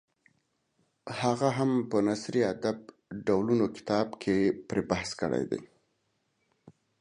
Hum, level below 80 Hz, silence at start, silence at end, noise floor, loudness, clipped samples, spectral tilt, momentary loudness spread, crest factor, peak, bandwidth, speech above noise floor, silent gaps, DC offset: none; -62 dBFS; 1.05 s; 0.3 s; -76 dBFS; -29 LUFS; under 0.1%; -6 dB/octave; 9 LU; 20 dB; -12 dBFS; 11 kHz; 47 dB; none; under 0.1%